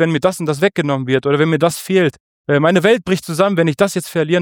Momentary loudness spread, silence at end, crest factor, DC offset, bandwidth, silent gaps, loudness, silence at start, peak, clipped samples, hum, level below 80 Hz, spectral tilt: 5 LU; 0 s; 14 dB; under 0.1%; 19 kHz; 2.20-2.44 s; -16 LUFS; 0 s; -2 dBFS; under 0.1%; none; -56 dBFS; -5.5 dB/octave